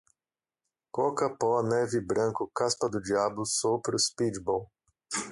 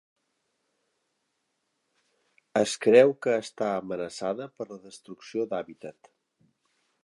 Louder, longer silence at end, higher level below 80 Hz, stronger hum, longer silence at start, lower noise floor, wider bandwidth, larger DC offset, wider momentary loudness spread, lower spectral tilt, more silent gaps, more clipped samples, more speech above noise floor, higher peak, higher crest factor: second, -29 LUFS vs -26 LUFS; second, 0 s vs 1.15 s; first, -64 dBFS vs -76 dBFS; neither; second, 0.95 s vs 2.55 s; first, under -90 dBFS vs -78 dBFS; about the same, 11.5 kHz vs 11.5 kHz; neither; second, 5 LU vs 25 LU; about the same, -3.5 dB/octave vs -4.5 dB/octave; neither; neither; first, over 61 dB vs 51 dB; second, -14 dBFS vs -6 dBFS; second, 16 dB vs 24 dB